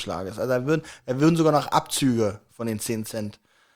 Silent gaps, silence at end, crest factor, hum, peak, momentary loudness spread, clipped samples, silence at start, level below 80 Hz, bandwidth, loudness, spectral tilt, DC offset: none; 0.4 s; 20 dB; none; -4 dBFS; 12 LU; under 0.1%; 0 s; -60 dBFS; 19.5 kHz; -24 LUFS; -5.5 dB/octave; under 0.1%